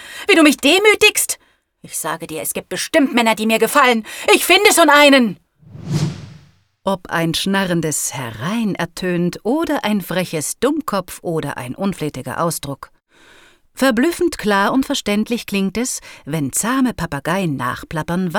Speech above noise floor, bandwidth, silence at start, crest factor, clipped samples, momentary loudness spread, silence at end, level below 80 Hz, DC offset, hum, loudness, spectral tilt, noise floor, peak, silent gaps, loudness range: 32 dB; 19.5 kHz; 0 s; 18 dB; under 0.1%; 14 LU; 0 s; -48 dBFS; under 0.1%; none; -16 LUFS; -3.5 dB/octave; -49 dBFS; 0 dBFS; none; 8 LU